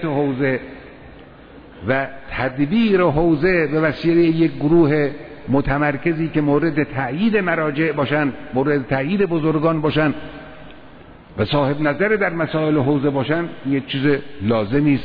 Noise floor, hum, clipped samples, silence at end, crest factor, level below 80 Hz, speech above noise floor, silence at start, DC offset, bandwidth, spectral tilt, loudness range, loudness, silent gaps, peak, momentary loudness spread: -42 dBFS; none; under 0.1%; 0 s; 14 dB; -42 dBFS; 24 dB; 0 s; under 0.1%; 5.2 kHz; -10 dB/octave; 4 LU; -19 LUFS; none; -4 dBFS; 8 LU